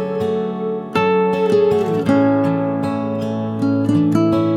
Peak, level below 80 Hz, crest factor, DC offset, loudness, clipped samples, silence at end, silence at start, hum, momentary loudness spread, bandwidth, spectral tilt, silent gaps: -2 dBFS; -56 dBFS; 14 dB; under 0.1%; -17 LUFS; under 0.1%; 0 s; 0 s; none; 7 LU; 12.5 kHz; -8 dB/octave; none